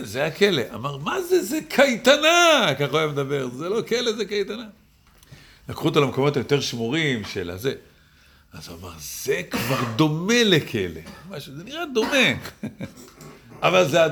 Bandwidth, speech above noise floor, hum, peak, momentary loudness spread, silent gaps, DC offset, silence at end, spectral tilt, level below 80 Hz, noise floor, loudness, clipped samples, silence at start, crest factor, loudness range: over 20 kHz; 32 dB; none; -2 dBFS; 20 LU; none; under 0.1%; 0 s; -4 dB/octave; -56 dBFS; -54 dBFS; -21 LUFS; under 0.1%; 0 s; 20 dB; 7 LU